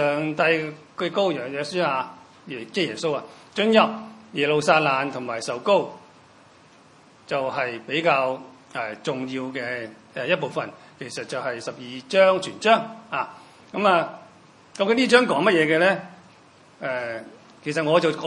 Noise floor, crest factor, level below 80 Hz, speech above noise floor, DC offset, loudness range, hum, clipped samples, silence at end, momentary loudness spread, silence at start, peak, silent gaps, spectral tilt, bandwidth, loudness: -52 dBFS; 24 dB; -74 dBFS; 29 dB; under 0.1%; 6 LU; none; under 0.1%; 0 s; 16 LU; 0 s; 0 dBFS; none; -4.5 dB/octave; 11 kHz; -23 LUFS